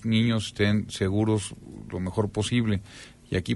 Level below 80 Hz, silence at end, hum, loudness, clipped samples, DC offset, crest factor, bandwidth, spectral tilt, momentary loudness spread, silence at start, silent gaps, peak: -50 dBFS; 0 s; none; -27 LUFS; under 0.1%; under 0.1%; 16 dB; 11.5 kHz; -6 dB/octave; 13 LU; 0 s; none; -10 dBFS